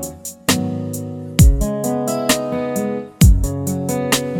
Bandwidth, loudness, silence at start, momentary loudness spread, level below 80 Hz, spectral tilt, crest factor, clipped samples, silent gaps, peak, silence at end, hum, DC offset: 18.5 kHz; -18 LUFS; 0 s; 11 LU; -22 dBFS; -5 dB/octave; 16 dB; under 0.1%; none; 0 dBFS; 0 s; none; under 0.1%